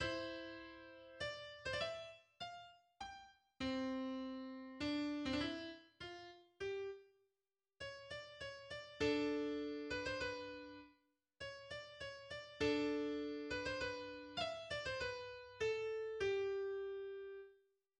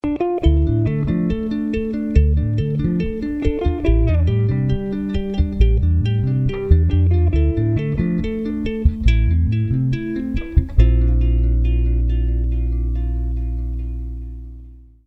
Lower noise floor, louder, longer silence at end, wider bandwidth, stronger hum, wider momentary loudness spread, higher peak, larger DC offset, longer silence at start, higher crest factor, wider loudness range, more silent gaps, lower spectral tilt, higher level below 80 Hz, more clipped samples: first, under -90 dBFS vs -40 dBFS; second, -45 LUFS vs -19 LUFS; first, 0.45 s vs 0.25 s; first, 10 kHz vs 5.8 kHz; neither; first, 14 LU vs 7 LU; second, -26 dBFS vs -2 dBFS; neither; about the same, 0 s vs 0.05 s; about the same, 18 dB vs 16 dB; first, 5 LU vs 2 LU; neither; second, -4.5 dB/octave vs -10 dB/octave; second, -68 dBFS vs -20 dBFS; neither